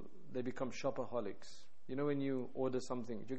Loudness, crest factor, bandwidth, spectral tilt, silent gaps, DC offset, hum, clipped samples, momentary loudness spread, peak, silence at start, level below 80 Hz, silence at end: -42 LUFS; 16 dB; 8.4 kHz; -6.5 dB/octave; none; 0.7%; none; under 0.1%; 11 LU; -26 dBFS; 0 s; -72 dBFS; 0 s